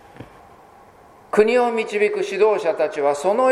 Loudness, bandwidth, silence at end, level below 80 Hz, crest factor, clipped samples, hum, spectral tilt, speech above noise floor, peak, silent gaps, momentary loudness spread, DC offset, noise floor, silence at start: -19 LUFS; 11.5 kHz; 0 s; -62 dBFS; 20 dB; under 0.1%; none; -4.5 dB/octave; 30 dB; -2 dBFS; none; 4 LU; under 0.1%; -48 dBFS; 0.2 s